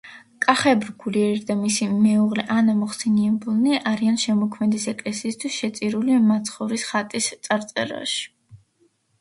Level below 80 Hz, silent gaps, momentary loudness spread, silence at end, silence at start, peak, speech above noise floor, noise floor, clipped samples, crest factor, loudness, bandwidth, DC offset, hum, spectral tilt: -66 dBFS; none; 8 LU; 0.65 s; 0.05 s; 0 dBFS; 43 dB; -64 dBFS; under 0.1%; 22 dB; -22 LUFS; 11.5 kHz; under 0.1%; none; -4.5 dB/octave